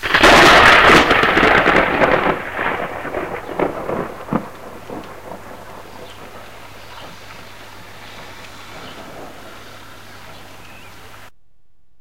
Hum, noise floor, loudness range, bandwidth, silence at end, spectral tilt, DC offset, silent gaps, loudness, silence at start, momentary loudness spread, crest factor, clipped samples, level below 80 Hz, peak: none; -61 dBFS; 24 LU; 17 kHz; 1.65 s; -3.5 dB/octave; 1%; none; -13 LUFS; 0 s; 29 LU; 18 dB; under 0.1%; -38 dBFS; 0 dBFS